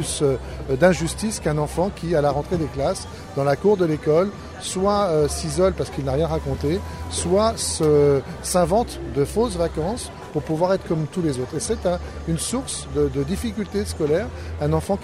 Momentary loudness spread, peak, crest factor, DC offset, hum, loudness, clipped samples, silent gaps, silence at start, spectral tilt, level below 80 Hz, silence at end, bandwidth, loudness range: 8 LU; -4 dBFS; 18 dB; under 0.1%; none; -22 LUFS; under 0.1%; none; 0 s; -5.5 dB/octave; -36 dBFS; 0 s; 15.5 kHz; 4 LU